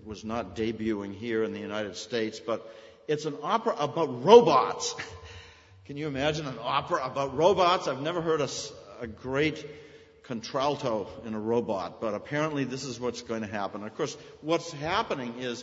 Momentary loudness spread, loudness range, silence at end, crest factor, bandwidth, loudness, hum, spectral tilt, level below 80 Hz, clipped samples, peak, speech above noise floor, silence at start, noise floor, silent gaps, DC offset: 15 LU; 7 LU; 0 s; 26 dB; 8 kHz; -28 LUFS; none; -4.5 dB/octave; -60 dBFS; under 0.1%; -2 dBFS; 24 dB; 0 s; -52 dBFS; none; under 0.1%